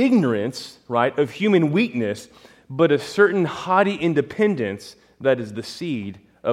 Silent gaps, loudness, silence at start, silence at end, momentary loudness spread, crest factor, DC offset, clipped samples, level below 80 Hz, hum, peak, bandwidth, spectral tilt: none; -21 LUFS; 0 s; 0 s; 12 LU; 18 dB; under 0.1%; under 0.1%; -64 dBFS; none; -4 dBFS; 13.5 kHz; -6.5 dB/octave